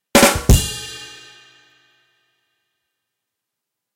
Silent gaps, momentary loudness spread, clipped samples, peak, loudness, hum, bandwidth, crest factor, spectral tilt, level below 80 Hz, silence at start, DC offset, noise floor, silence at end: none; 24 LU; under 0.1%; -2 dBFS; -15 LUFS; none; 16 kHz; 20 dB; -4 dB/octave; -26 dBFS; 0.15 s; under 0.1%; -82 dBFS; 2.9 s